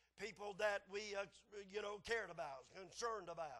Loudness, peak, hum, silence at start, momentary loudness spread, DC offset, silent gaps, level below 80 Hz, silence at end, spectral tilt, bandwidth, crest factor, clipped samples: -47 LUFS; -28 dBFS; none; 0.15 s; 11 LU; under 0.1%; none; -76 dBFS; 0 s; -2.5 dB/octave; 12 kHz; 20 dB; under 0.1%